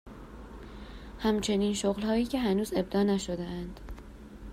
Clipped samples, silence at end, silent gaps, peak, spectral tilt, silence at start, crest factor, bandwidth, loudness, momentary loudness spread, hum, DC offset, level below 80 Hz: under 0.1%; 0 s; none; -16 dBFS; -5.5 dB/octave; 0.05 s; 14 dB; 15.5 kHz; -30 LUFS; 19 LU; none; under 0.1%; -48 dBFS